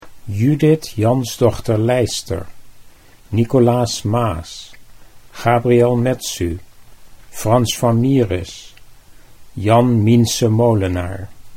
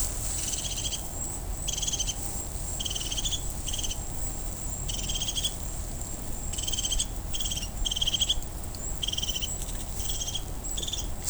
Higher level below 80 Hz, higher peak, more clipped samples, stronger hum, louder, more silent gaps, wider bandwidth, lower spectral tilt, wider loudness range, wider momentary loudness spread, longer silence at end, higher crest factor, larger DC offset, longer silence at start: second, -42 dBFS vs -36 dBFS; first, 0 dBFS vs -10 dBFS; neither; neither; first, -16 LUFS vs -30 LUFS; neither; second, 16.5 kHz vs over 20 kHz; first, -6 dB/octave vs -1.5 dB/octave; about the same, 3 LU vs 2 LU; first, 15 LU vs 6 LU; about the same, 0 s vs 0 s; about the same, 16 dB vs 20 dB; neither; about the same, 0.05 s vs 0 s